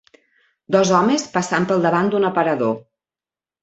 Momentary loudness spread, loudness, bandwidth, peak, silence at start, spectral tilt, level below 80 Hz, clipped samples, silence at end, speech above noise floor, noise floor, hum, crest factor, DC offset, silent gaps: 6 LU; -18 LUFS; 8.2 kHz; -2 dBFS; 0.7 s; -5 dB/octave; -62 dBFS; under 0.1%; 0.8 s; over 73 dB; under -90 dBFS; none; 18 dB; under 0.1%; none